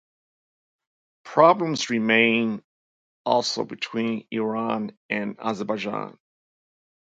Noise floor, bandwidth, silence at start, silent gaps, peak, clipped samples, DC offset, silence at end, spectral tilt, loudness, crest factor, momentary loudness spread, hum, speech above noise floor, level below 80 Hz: under -90 dBFS; 8.6 kHz; 1.25 s; 2.64-3.25 s, 4.97-5.09 s; -2 dBFS; under 0.1%; under 0.1%; 1.1 s; -4.5 dB/octave; -23 LUFS; 24 dB; 12 LU; none; over 67 dB; -72 dBFS